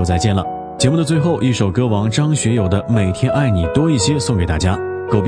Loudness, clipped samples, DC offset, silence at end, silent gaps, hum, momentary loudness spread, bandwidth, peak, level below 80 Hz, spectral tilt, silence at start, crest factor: -16 LUFS; under 0.1%; under 0.1%; 0 s; none; none; 3 LU; 10.5 kHz; 0 dBFS; -34 dBFS; -6 dB/octave; 0 s; 16 dB